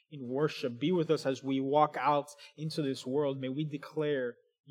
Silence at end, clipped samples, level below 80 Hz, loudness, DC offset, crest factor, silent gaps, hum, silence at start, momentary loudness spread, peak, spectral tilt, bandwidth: 0.4 s; under 0.1%; under -90 dBFS; -32 LUFS; under 0.1%; 20 dB; none; none; 0.1 s; 10 LU; -12 dBFS; -6.5 dB/octave; 14 kHz